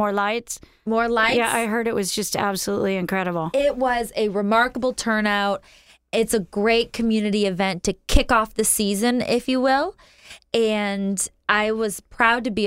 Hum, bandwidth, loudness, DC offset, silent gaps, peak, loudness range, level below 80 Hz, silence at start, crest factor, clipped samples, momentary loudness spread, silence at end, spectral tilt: none; 16 kHz; -21 LUFS; under 0.1%; none; -2 dBFS; 1 LU; -36 dBFS; 0 s; 20 dB; under 0.1%; 6 LU; 0 s; -3.5 dB/octave